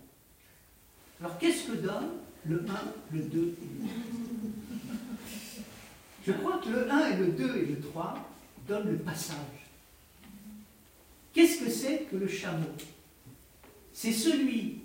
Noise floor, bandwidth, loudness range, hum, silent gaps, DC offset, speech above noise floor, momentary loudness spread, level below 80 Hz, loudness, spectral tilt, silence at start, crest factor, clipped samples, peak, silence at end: -60 dBFS; 16 kHz; 6 LU; none; none; under 0.1%; 29 dB; 21 LU; -66 dBFS; -32 LUFS; -5 dB/octave; 0 s; 22 dB; under 0.1%; -10 dBFS; 0 s